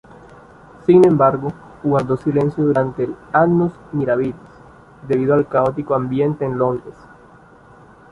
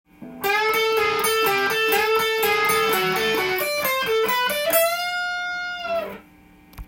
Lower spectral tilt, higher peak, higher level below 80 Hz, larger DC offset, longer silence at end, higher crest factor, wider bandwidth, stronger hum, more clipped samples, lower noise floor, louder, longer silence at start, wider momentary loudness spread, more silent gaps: first, -9.5 dB/octave vs -1.5 dB/octave; first, -2 dBFS vs -6 dBFS; about the same, -50 dBFS vs -52 dBFS; neither; first, 1.2 s vs 0 s; about the same, 16 dB vs 16 dB; second, 10.5 kHz vs 17 kHz; neither; neither; second, -45 dBFS vs -50 dBFS; about the same, -18 LUFS vs -20 LUFS; first, 0.9 s vs 0.2 s; first, 12 LU vs 8 LU; neither